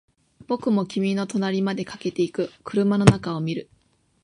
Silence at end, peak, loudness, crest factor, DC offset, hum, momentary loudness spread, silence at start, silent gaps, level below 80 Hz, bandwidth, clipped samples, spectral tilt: 0.6 s; -2 dBFS; -23 LUFS; 22 dB; under 0.1%; none; 12 LU; 0.5 s; none; -50 dBFS; 11.5 kHz; under 0.1%; -6.5 dB/octave